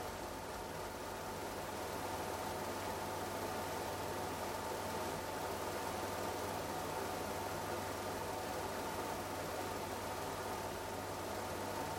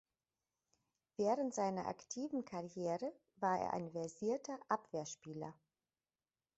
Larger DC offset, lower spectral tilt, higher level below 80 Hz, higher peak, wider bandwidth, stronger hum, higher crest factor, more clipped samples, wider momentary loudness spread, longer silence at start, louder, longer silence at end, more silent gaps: neither; second, -4 dB/octave vs -5.5 dB/octave; first, -62 dBFS vs -82 dBFS; second, -28 dBFS vs -22 dBFS; first, 16.5 kHz vs 8 kHz; neither; second, 14 dB vs 22 dB; neither; second, 3 LU vs 11 LU; second, 0 s vs 1.2 s; about the same, -42 LUFS vs -42 LUFS; second, 0 s vs 1.05 s; neither